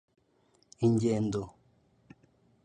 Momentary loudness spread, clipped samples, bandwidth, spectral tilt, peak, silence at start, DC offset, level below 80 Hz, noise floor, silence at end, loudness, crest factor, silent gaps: 12 LU; under 0.1%; 9.8 kHz; -8 dB/octave; -16 dBFS; 0.8 s; under 0.1%; -62 dBFS; -69 dBFS; 1.15 s; -30 LUFS; 18 dB; none